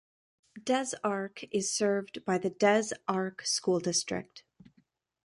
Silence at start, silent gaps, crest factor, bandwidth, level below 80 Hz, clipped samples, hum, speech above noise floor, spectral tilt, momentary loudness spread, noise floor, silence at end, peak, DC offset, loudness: 0.55 s; none; 20 dB; 11.5 kHz; -74 dBFS; under 0.1%; none; 40 dB; -3.5 dB/octave; 10 LU; -71 dBFS; 0.85 s; -12 dBFS; under 0.1%; -30 LUFS